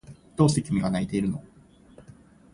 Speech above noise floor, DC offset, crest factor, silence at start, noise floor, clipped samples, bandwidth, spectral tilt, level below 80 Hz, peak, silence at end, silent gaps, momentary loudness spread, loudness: 28 dB; under 0.1%; 20 dB; 0.1 s; -52 dBFS; under 0.1%; 11.5 kHz; -6.5 dB/octave; -52 dBFS; -8 dBFS; 0.55 s; none; 13 LU; -26 LUFS